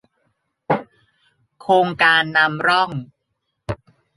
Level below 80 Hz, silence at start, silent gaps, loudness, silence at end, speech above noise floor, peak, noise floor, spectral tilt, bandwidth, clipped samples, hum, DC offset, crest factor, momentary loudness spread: -54 dBFS; 0.7 s; none; -17 LUFS; 0.45 s; 58 dB; -2 dBFS; -75 dBFS; -5 dB/octave; 11.5 kHz; under 0.1%; none; under 0.1%; 20 dB; 18 LU